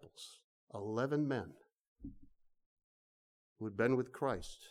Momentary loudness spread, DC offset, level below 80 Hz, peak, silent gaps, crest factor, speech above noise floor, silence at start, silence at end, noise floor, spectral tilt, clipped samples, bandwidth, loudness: 20 LU; under 0.1%; -64 dBFS; -20 dBFS; 0.44-0.67 s, 1.80-1.96 s, 2.66-2.77 s, 2.83-3.56 s; 20 dB; over 53 dB; 0.05 s; 0 s; under -90 dBFS; -6.5 dB/octave; under 0.1%; 14 kHz; -38 LUFS